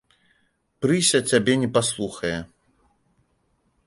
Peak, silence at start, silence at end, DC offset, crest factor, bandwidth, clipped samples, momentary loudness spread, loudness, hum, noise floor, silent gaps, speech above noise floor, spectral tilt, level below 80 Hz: -4 dBFS; 0.8 s; 1.4 s; under 0.1%; 22 dB; 11.5 kHz; under 0.1%; 10 LU; -22 LUFS; none; -68 dBFS; none; 47 dB; -3.5 dB/octave; -56 dBFS